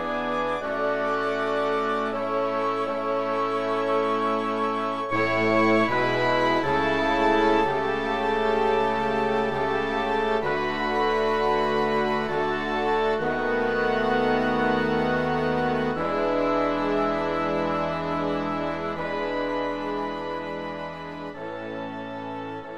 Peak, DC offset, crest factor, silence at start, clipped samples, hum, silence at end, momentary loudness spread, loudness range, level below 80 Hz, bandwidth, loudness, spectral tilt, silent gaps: -8 dBFS; 0.7%; 16 dB; 0 s; under 0.1%; none; 0 s; 9 LU; 6 LU; -50 dBFS; 11.5 kHz; -25 LUFS; -6 dB/octave; none